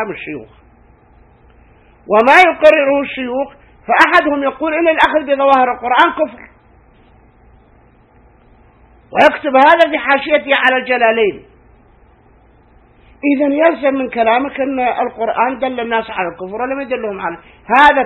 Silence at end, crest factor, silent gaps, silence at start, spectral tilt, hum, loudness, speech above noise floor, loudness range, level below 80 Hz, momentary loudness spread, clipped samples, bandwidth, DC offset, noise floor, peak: 0 s; 14 dB; none; 0 s; -4.5 dB/octave; none; -13 LUFS; 35 dB; 6 LU; -48 dBFS; 13 LU; 0.2%; 11.5 kHz; under 0.1%; -48 dBFS; 0 dBFS